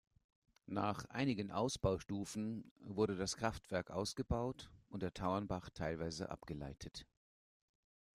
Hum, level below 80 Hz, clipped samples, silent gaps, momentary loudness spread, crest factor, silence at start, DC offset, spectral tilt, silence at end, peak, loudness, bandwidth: none; -60 dBFS; under 0.1%; 2.71-2.76 s; 11 LU; 20 dB; 0.7 s; under 0.1%; -5.5 dB/octave; 1.1 s; -22 dBFS; -42 LUFS; 14.5 kHz